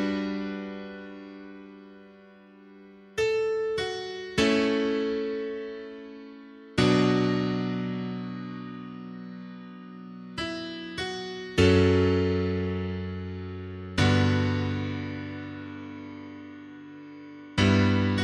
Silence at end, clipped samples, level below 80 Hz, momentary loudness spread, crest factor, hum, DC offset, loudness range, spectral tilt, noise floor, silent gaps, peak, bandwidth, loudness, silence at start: 0 s; under 0.1%; -52 dBFS; 21 LU; 20 dB; none; under 0.1%; 9 LU; -6.5 dB/octave; -52 dBFS; none; -8 dBFS; 11 kHz; -27 LUFS; 0 s